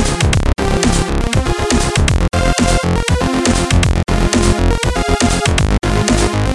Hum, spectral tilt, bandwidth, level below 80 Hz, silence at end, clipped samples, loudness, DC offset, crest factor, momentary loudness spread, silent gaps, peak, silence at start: none; -4.5 dB/octave; 12 kHz; -18 dBFS; 0 s; under 0.1%; -14 LUFS; under 0.1%; 14 dB; 3 LU; none; 0 dBFS; 0 s